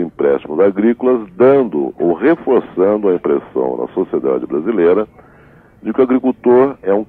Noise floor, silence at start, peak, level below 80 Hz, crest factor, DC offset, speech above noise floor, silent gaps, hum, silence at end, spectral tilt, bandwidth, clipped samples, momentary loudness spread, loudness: -44 dBFS; 0 s; -2 dBFS; -54 dBFS; 12 dB; under 0.1%; 31 dB; none; none; 0.05 s; -10 dB/octave; 3.8 kHz; under 0.1%; 7 LU; -14 LUFS